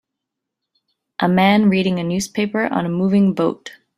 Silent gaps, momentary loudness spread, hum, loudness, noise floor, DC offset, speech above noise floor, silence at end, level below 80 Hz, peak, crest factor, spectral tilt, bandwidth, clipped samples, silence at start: none; 8 LU; none; -17 LUFS; -81 dBFS; under 0.1%; 64 dB; 0.3 s; -56 dBFS; -2 dBFS; 16 dB; -6 dB/octave; 13.5 kHz; under 0.1%; 1.2 s